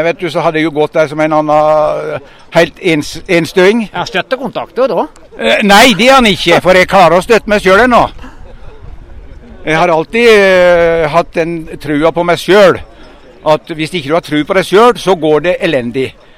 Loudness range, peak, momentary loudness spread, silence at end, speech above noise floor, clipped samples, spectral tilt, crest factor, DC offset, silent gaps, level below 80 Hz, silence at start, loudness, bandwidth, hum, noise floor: 5 LU; 0 dBFS; 11 LU; 0.25 s; 26 dB; 1%; -4.5 dB/octave; 10 dB; under 0.1%; none; -34 dBFS; 0 s; -9 LUFS; 16.5 kHz; none; -35 dBFS